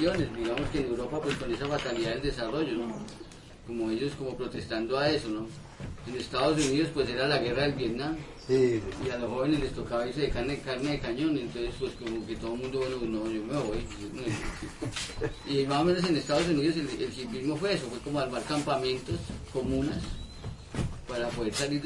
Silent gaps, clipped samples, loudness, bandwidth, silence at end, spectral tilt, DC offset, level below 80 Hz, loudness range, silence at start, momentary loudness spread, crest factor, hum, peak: none; under 0.1%; -31 LUFS; 11.5 kHz; 0 s; -5.5 dB/octave; under 0.1%; -46 dBFS; 4 LU; 0 s; 11 LU; 18 dB; none; -12 dBFS